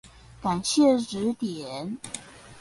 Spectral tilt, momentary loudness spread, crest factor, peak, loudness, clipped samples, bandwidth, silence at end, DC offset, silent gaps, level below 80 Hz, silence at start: -4.5 dB/octave; 16 LU; 18 dB; -10 dBFS; -26 LUFS; under 0.1%; 11.5 kHz; 0 s; under 0.1%; none; -58 dBFS; 0.05 s